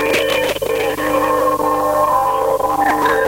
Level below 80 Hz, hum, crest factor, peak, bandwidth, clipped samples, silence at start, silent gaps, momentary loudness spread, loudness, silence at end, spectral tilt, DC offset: -42 dBFS; 50 Hz at -40 dBFS; 12 dB; -4 dBFS; 17 kHz; under 0.1%; 0 s; none; 3 LU; -16 LUFS; 0 s; -3.5 dB/octave; under 0.1%